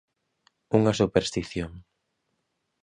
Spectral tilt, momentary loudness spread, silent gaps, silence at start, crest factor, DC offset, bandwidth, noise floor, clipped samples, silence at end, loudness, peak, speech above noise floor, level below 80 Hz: -6 dB/octave; 12 LU; none; 0.7 s; 22 dB; under 0.1%; 10.5 kHz; -77 dBFS; under 0.1%; 1.05 s; -25 LUFS; -6 dBFS; 53 dB; -50 dBFS